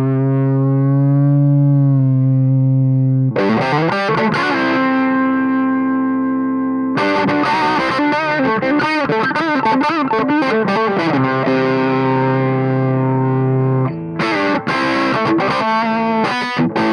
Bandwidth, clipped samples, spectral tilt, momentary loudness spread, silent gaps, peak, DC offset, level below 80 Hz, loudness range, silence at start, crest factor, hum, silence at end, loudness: 6.8 kHz; under 0.1%; -8 dB/octave; 3 LU; none; -4 dBFS; under 0.1%; -54 dBFS; 2 LU; 0 s; 10 dB; none; 0 s; -15 LUFS